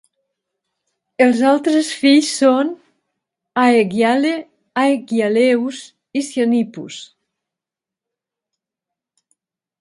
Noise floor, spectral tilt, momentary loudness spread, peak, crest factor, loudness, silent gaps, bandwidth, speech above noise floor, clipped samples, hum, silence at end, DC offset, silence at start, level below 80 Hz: -87 dBFS; -4 dB/octave; 15 LU; 0 dBFS; 18 dB; -16 LUFS; none; 11.5 kHz; 72 dB; under 0.1%; none; 2.75 s; under 0.1%; 1.2 s; -72 dBFS